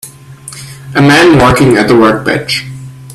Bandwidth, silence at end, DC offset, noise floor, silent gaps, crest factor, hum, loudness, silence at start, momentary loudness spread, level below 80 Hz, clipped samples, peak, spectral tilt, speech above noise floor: 14.5 kHz; 0 s; under 0.1%; -30 dBFS; none; 10 dB; none; -7 LUFS; 0.05 s; 22 LU; -34 dBFS; 0.2%; 0 dBFS; -5.5 dB/octave; 24 dB